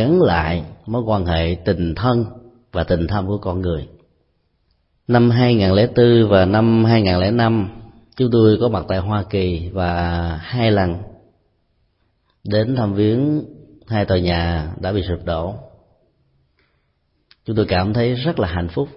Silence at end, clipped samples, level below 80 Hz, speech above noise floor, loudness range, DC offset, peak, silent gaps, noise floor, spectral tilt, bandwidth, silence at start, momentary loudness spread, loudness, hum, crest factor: 0.05 s; under 0.1%; -36 dBFS; 49 dB; 8 LU; under 0.1%; -2 dBFS; none; -65 dBFS; -12 dB/octave; 5.8 kHz; 0 s; 11 LU; -18 LUFS; none; 18 dB